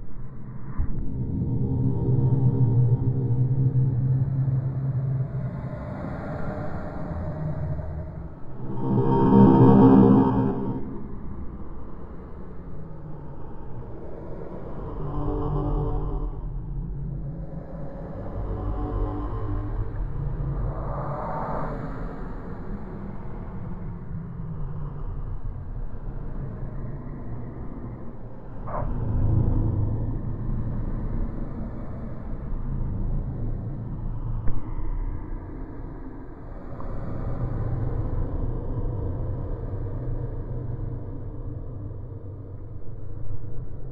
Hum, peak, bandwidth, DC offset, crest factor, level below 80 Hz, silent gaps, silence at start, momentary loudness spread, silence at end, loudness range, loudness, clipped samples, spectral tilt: none; -2 dBFS; 3.5 kHz; under 0.1%; 24 dB; -32 dBFS; none; 0 s; 17 LU; 0 s; 17 LU; -27 LUFS; under 0.1%; -12 dB/octave